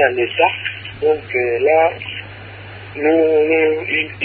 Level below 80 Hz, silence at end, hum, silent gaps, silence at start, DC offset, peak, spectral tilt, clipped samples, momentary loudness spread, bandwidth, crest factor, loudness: -50 dBFS; 0 s; none; none; 0 s; under 0.1%; -2 dBFS; -10 dB/octave; under 0.1%; 18 LU; 4.6 kHz; 16 dB; -16 LUFS